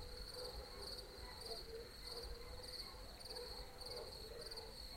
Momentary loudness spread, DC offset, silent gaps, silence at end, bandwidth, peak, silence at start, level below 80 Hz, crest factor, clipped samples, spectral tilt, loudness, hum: 3 LU; under 0.1%; none; 0 s; 16.5 kHz; -34 dBFS; 0 s; -58 dBFS; 18 dB; under 0.1%; -3 dB/octave; -51 LUFS; none